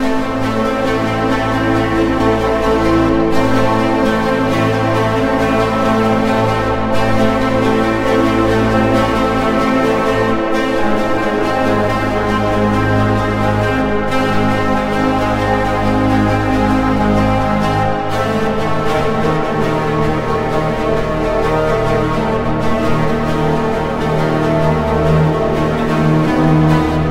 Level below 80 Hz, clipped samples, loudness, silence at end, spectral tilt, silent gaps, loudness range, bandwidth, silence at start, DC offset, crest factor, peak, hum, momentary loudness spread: -28 dBFS; under 0.1%; -15 LUFS; 0 s; -7 dB/octave; none; 2 LU; 16 kHz; 0 s; under 0.1%; 14 dB; 0 dBFS; none; 3 LU